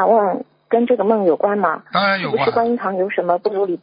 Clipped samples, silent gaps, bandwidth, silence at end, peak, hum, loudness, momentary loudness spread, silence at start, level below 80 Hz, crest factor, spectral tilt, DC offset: under 0.1%; none; 5.2 kHz; 0.05 s; -2 dBFS; none; -18 LUFS; 4 LU; 0 s; -64 dBFS; 14 dB; -11 dB/octave; under 0.1%